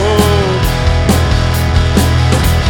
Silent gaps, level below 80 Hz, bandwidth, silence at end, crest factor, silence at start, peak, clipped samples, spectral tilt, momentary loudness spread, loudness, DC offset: none; -16 dBFS; 19 kHz; 0 s; 10 dB; 0 s; 0 dBFS; under 0.1%; -5.5 dB/octave; 2 LU; -12 LUFS; under 0.1%